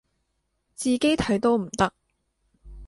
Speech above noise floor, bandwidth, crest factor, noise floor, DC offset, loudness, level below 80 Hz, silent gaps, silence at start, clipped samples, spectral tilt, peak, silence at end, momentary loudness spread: 52 dB; 11.5 kHz; 20 dB; -75 dBFS; under 0.1%; -24 LUFS; -50 dBFS; none; 0.8 s; under 0.1%; -4.5 dB/octave; -8 dBFS; 0 s; 4 LU